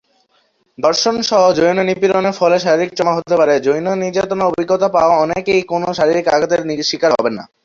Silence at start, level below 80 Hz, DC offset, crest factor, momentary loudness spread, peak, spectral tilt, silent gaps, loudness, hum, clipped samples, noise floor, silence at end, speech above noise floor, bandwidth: 0.8 s; -54 dBFS; under 0.1%; 14 dB; 5 LU; 0 dBFS; -4.5 dB/octave; none; -15 LUFS; none; under 0.1%; -60 dBFS; 0.2 s; 45 dB; 7.6 kHz